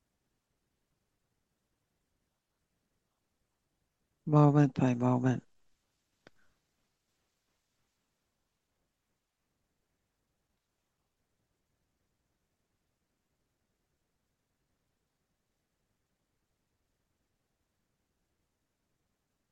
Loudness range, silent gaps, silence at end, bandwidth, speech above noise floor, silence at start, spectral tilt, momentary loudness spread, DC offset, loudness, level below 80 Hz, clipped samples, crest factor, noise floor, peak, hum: 7 LU; none; 14.15 s; 7.6 kHz; 58 dB; 4.25 s; -9 dB/octave; 12 LU; under 0.1%; -28 LUFS; -80 dBFS; under 0.1%; 24 dB; -84 dBFS; -14 dBFS; none